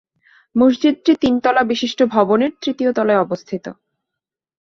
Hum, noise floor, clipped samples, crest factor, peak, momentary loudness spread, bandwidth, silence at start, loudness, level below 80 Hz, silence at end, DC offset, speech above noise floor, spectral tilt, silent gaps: none; -84 dBFS; under 0.1%; 16 dB; -2 dBFS; 10 LU; 7.2 kHz; 0.55 s; -17 LUFS; -56 dBFS; 1.05 s; under 0.1%; 68 dB; -5.5 dB/octave; none